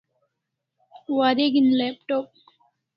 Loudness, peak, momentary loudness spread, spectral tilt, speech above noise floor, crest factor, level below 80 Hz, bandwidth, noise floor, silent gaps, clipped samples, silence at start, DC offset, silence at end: -22 LUFS; -6 dBFS; 16 LU; -7.5 dB/octave; 60 dB; 18 dB; -74 dBFS; 5.8 kHz; -81 dBFS; none; under 0.1%; 1.1 s; under 0.1%; 0.7 s